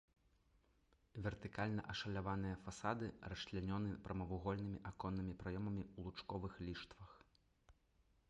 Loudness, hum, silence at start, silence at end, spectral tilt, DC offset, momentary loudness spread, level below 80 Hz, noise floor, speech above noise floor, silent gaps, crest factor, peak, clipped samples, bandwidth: -46 LUFS; none; 1.15 s; 0.6 s; -6.5 dB/octave; under 0.1%; 7 LU; -60 dBFS; -77 dBFS; 31 dB; none; 22 dB; -26 dBFS; under 0.1%; 10.5 kHz